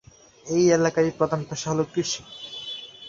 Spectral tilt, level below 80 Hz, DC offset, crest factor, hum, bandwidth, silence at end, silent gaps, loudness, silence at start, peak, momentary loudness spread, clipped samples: -4.5 dB/octave; -60 dBFS; under 0.1%; 18 dB; none; 7.6 kHz; 0 s; none; -24 LUFS; 0.45 s; -8 dBFS; 15 LU; under 0.1%